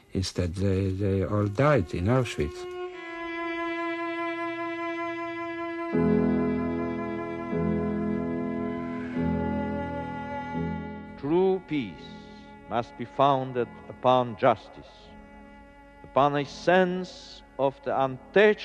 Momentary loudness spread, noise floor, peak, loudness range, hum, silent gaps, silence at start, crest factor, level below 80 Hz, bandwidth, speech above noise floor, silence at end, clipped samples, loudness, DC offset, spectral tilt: 13 LU; -50 dBFS; -8 dBFS; 4 LU; none; none; 0.15 s; 20 dB; -50 dBFS; 11.5 kHz; 24 dB; 0 s; under 0.1%; -28 LUFS; under 0.1%; -7 dB/octave